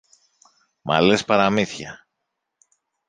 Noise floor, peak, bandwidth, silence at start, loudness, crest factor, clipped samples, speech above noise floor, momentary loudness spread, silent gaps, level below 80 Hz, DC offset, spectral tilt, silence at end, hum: -79 dBFS; -2 dBFS; 9.6 kHz; 0.85 s; -19 LUFS; 22 dB; under 0.1%; 60 dB; 18 LU; none; -58 dBFS; under 0.1%; -5 dB/octave; 1.15 s; none